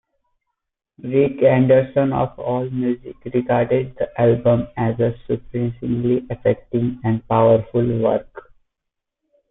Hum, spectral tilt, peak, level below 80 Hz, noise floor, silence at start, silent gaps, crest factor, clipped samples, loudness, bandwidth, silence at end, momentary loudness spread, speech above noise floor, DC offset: none; -13 dB/octave; -4 dBFS; -48 dBFS; -81 dBFS; 1.05 s; none; 16 dB; under 0.1%; -19 LUFS; 3.9 kHz; 1.1 s; 9 LU; 62 dB; under 0.1%